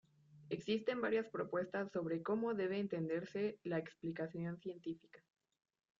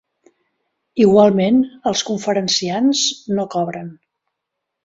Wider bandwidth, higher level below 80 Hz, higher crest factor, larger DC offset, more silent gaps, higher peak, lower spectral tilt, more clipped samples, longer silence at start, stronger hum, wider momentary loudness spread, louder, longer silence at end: about the same, 7.6 kHz vs 7.8 kHz; second, -82 dBFS vs -58 dBFS; about the same, 18 dB vs 18 dB; neither; neither; second, -24 dBFS vs -2 dBFS; about the same, -5.5 dB/octave vs -4.5 dB/octave; neither; second, 0.3 s vs 0.95 s; neither; second, 9 LU vs 13 LU; second, -41 LUFS vs -16 LUFS; about the same, 0.85 s vs 0.9 s